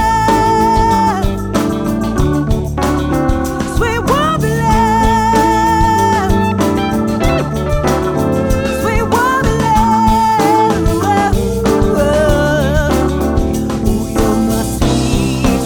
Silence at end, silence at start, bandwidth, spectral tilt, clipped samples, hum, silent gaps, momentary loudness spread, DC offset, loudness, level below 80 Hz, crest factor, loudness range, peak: 0 s; 0 s; over 20 kHz; -6 dB/octave; under 0.1%; none; none; 5 LU; under 0.1%; -13 LUFS; -22 dBFS; 12 dB; 2 LU; 0 dBFS